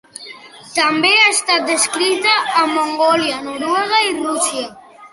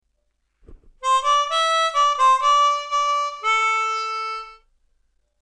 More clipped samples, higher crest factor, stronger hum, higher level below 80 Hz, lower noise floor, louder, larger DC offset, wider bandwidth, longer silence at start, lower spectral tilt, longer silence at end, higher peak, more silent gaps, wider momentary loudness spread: neither; about the same, 16 dB vs 14 dB; neither; second, -64 dBFS vs -56 dBFS; second, -37 dBFS vs -70 dBFS; first, -14 LUFS vs -19 LUFS; neither; first, 12 kHz vs 10.5 kHz; second, 0.2 s vs 0.7 s; first, -0.5 dB/octave vs 2.5 dB/octave; second, 0.05 s vs 0.9 s; first, -2 dBFS vs -8 dBFS; neither; first, 13 LU vs 10 LU